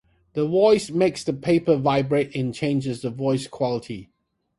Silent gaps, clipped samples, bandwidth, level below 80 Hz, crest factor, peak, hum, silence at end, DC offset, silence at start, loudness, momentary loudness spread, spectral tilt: none; under 0.1%; 11.5 kHz; -58 dBFS; 16 dB; -6 dBFS; none; 0.55 s; under 0.1%; 0.35 s; -22 LUFS; 11 LU; -6.5 dB/octave